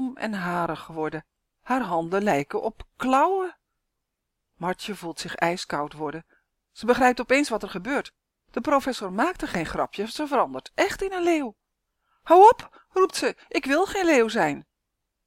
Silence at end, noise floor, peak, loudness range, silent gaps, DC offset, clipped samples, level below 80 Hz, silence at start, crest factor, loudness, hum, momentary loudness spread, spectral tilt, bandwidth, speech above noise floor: 0.65 s; -81 dBFS; -4 dBFS; 7 LU; none; under 0.1%; under 0.1%; -54 dBFS; 0 s; 22 dB; -24 LUFS; none; 13 LU; -4.5 dB/octave; 16.5 kHz; 57 dB